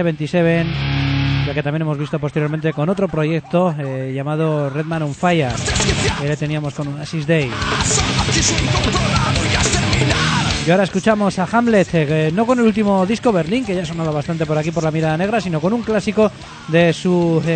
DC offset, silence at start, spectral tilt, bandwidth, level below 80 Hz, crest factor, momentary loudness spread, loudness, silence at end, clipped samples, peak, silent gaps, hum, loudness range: under 0.1%; 0 s; -5 dB/octave; 9.2 kHz; -34 dBFS; 16 dB; 6 LU; -17 LUFS; 0 s; under 0.1%; 0 dBFS; none; none; 3 LU